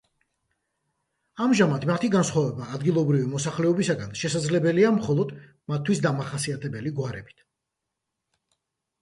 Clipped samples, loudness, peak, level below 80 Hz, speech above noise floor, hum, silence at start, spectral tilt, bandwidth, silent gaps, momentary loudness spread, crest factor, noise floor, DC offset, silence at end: under 0.1%; -25 LUFS; -8 dBFS; -62 dBFS; 59 dB; none; 1.35 s; -6 dB/octave; 11.5 kHz; none; 10 LU; 18 dB; -83 dBFS; under 0.1%; 1.75 s